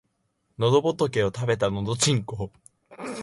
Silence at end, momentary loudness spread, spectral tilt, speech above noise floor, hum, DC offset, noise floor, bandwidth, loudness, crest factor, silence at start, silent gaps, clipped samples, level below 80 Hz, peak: 0 s; 14 LU; -4.5 dB/octave; 49 dB; none; under 0.1%; -73 dBFS; 11.5 kHz; -24 LUFS; 18 dB; 0.6 s; none; under 0.1%; -52 dBFS; -8 dBFS